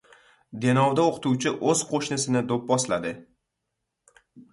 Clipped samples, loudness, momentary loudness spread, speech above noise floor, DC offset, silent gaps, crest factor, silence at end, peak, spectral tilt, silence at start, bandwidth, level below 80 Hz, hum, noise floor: under 0.1%; -24 LUFS; 8 LU; 57 dB; under 0.1%; none; 18 dB; 0.1 s; -8 dBFS; -4.5 dB/octave; 0.5 s; 11.5 kHz; -64 dBFS; none; -81 dBFS